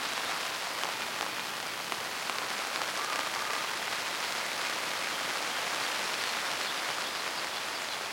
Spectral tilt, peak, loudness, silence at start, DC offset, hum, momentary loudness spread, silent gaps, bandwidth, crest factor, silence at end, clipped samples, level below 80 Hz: 0 dB/octave; -10 dBFS; -32 LUFS; 0 s; under 0.1%; none; 3 LU; none; 17 kHz; 24 dB; 0 s; under 0.1%; -76 dBFS